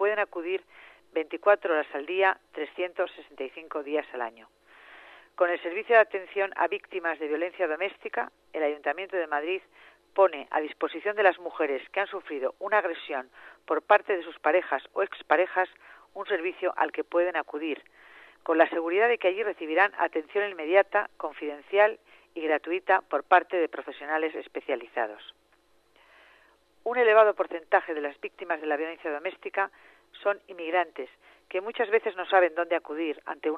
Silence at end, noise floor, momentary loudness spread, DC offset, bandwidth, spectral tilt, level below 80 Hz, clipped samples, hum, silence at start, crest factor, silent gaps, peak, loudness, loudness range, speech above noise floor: 0 s; -65 dBFS; 12 LU; under 0.1%; 5.6 kHz; -5 dB/octave; -78 dBFS; under 0.1%; none; 0 s; 22 dB; none; -6 dBFS; -28 LUFS; 5 LU; 37 dB